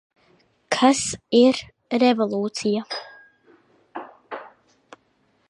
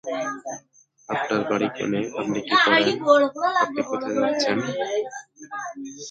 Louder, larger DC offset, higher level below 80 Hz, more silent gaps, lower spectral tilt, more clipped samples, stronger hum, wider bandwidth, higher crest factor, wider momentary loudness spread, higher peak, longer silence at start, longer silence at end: about the same, -21 LUFS vs -22 LUFS; neither; first, -62 dBFS vs -68 dBFS; neither; about the same, -3.5 dB/octave vs -4 dB/octave; neither; neither; first, 11 kHz vs 9 kHz; about the same, 20 dB vs 20 dB; first, 21 LU vs 17 LU; about the same, -4 dBFS vs -4 dBFS; first, 0.7 s vs 0.05 s; first, 1.05 s vs 0 s